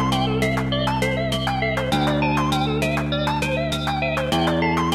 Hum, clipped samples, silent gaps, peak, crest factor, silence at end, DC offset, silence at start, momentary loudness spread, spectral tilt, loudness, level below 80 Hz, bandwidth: none; under 0.1%; none; -6 dBFS; 14 dB; 0 s; under 0.1%; 0 s; 2 LU; -5.5 dB/octave; -21 LUFS; -36 dBFS; 15.5 kHz